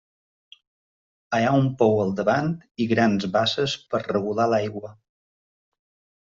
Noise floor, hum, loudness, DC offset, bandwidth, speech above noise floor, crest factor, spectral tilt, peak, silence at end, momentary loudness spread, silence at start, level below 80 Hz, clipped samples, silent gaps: under -90 dBFS; none; -23 LUFS; under 0.1%; 7.6 kHz; over 68 dB; 20 dB; -5 dB/octave; -6 dBFS; 1.45 s; 8 LU; 1.3 s; -60 dBFS; under 0.1%; 2.71-2.75 s